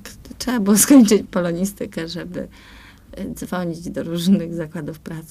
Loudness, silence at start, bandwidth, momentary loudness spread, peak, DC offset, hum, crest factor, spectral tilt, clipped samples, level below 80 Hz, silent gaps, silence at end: -18 LUFS; 0.05 s; 15.5 kHz; 20 LU; 0 dBFS; under 0.1%; none; 20 dB; -5 dB/octave; under 0.1%; -46 dBFS; none; 0.05 s